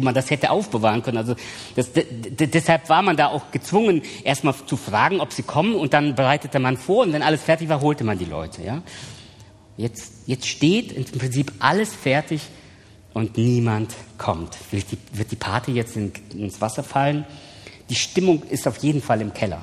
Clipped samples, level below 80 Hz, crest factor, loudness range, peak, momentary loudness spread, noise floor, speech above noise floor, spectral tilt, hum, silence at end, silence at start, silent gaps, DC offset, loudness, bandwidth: under 0.1%; -54 dBFS; 22 dB; 6 LU; 0 dBFS; 12 LU; -47 dBFS; 26 dB; -5.5 dB/octave; none; 0 s; 0 s; none; under 0.1%; -22 LUFS; 14.5 kHz